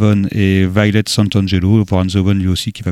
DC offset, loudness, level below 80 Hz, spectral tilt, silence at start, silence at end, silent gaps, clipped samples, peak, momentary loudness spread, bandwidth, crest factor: under 0.1%; -14 LUFS; -38 dBFS; -6 dB/octave; 0 s; 0 s; none; under 0.1%; 0 dBFS; 2 LU; 13.5 kHz; 12 dB